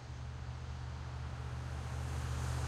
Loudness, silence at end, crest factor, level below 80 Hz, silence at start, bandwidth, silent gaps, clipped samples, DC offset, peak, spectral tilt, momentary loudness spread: -43 LUFS; 0 s; 14 dB; -48 dBFS; 0 s; 13.5 kHz; none; under 0.1%; under 0.1%; -26 dBFS; -5.5 dB/octave; 6 LU